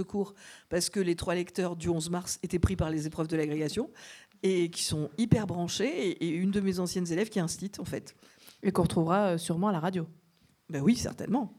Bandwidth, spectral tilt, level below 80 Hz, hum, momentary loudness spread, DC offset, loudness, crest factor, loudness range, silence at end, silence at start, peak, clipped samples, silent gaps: 15.5 kHz; -5.5 dB/octave; -50 dBFS; none; 9 LU; under 0.1%; -31 LUFS; 20 dB; 2 LU; 0.05 s; 0 s; -10 dBFS; under 0.1%; none